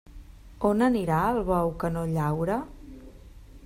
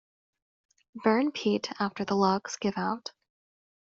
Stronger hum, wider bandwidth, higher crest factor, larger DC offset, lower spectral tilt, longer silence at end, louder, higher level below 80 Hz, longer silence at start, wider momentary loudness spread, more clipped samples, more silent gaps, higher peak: neither; first, 16 kHz vs 7.6 kHz; about the same, 18 dB vs 20 dB; neither; first, -8 dB/octave vs -4.5 dB/octave; second, 0 s vs 0.9 s; first, -26 LUFS vs -29 LUFS; first, -44 dBFS vs -72 dBFS; second, 0.1 s vs 0.95 s; first, 14 LU vs 7 LU; neither; neither; about the same, -10 dBFS vs -10 dBFS